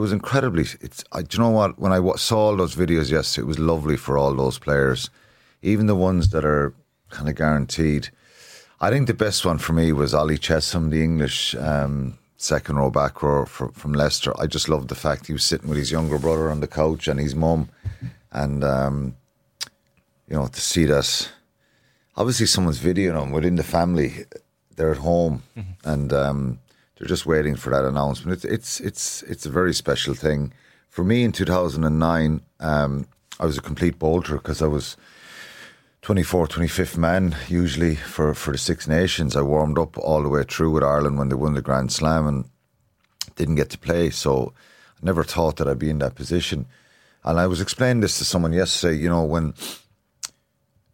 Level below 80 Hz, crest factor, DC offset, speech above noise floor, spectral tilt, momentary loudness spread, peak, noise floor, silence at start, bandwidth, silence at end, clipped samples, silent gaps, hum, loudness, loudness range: -36 dBFS; 18 dB; under 0.1%; 45 dB; -5 dB/octave; 12 LU; -4 dBFS; -66 dBFS; 0 s; 17 kHz; 0.65 s; under 0.1%; none; none; -22 LUFS; 4 LU